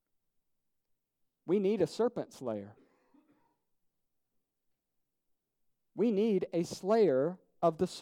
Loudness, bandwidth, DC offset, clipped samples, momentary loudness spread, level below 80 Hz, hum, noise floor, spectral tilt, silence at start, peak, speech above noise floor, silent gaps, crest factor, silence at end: -32 LUFS; 14.5 kHz; under 0.1%; under 0.1%; 12 LU; -76 dBFS; none; -83 dBFS; -6.5 dB/octave; 1.45 s; -16 dBFS; 52 dB; none; 20 dB; 0 s